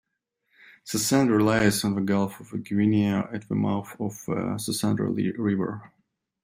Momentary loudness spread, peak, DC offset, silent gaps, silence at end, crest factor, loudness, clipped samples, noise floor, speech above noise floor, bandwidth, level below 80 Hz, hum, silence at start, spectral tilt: 11 LU; -8 dBFS; under 0.1%; none; 0.55 s; 18 dB; -25 LUFS; under 0.1%; -77 dBFS; 53 dB; 16 kHz; -60 dBFS; none; 0.85 s; -5.5 dB/octave